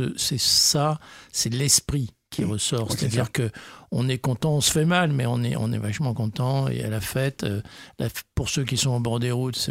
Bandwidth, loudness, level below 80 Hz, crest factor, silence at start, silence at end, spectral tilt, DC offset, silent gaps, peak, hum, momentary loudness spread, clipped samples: 16 kHz; -24 LUFS; -48 dBFS; 20 dB; 0 s; 0 s; -4 dB/octave; under 0.1%; none; -4 dBFS; none; 12 LU; under 0.1%